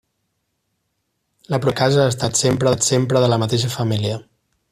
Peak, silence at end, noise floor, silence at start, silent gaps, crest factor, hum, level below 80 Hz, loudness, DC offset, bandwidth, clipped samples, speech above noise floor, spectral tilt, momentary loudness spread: -2 dBFS; 0.5 s; -72 dBFS; 1.5 s; none; 16 dB; none; -52 dBFS; -18 LUFS; under 0.1%; 15 kHz; under 0.1%; 55 dB; -4.5 dB/octave; 7 LU